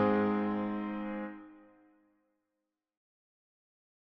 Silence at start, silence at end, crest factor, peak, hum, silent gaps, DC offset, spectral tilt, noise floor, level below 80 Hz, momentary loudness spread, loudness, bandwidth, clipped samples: 0 s; 2.55 s; 20 dB; -18 dBFS; none; none; under 0.1%; -6.5 dB/octave; -87 dBFS; -72 dBFS; 19 LU; -34 LUFS; 5.6 kHz; under 0.1%